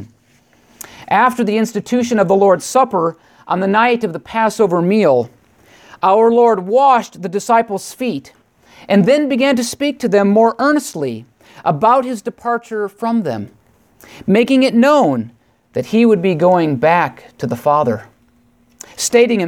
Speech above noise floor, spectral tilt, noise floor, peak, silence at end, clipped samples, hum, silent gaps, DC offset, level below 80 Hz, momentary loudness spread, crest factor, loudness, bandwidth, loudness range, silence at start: 40 dB; -5.5 dB/octave; -54 dBFS; 0 dBFS; 0 s; under 0.1%; none; none; under 0.1%; -60 dBFS; 12 LU; 14 dB; -14 LUFS; 17 kHz; 2 LU; 0 s